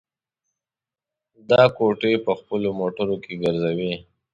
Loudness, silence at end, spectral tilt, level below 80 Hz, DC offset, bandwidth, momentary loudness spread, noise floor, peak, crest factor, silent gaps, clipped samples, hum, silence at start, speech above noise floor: -22 LUFS; 0.3 s; -7.5 dB/octave; -58 dBFS; under 0.1%; 7.8 kHz; 10 LU; under -90 dBFS; -2 dBFS; 20 dB; none; under 0.1%; none; 1.5 s; over 69 dB